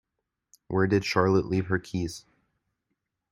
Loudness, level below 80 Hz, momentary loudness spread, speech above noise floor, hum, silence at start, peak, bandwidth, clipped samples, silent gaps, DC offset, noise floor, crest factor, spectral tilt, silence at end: -26 LUFS; -56 dBFS; 10 LU; 58 dB; none; 0.7 s; -6 dBFS; 13 kHz; under 0.1%; none; under 0.1%; -84 dBFS; 22 dB; -6.5 dB/octave; 1.1 s